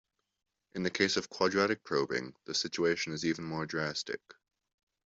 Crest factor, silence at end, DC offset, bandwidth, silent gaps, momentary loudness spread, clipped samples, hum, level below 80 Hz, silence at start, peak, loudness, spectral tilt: 22 dB; 0.8 s; under 0.1%; 8 kHz; none; 8 LU; under 0.1%; none; -72 dBFS; 0.75 s; -12 dBFS; -33 LUFS; -3.5 dB/octave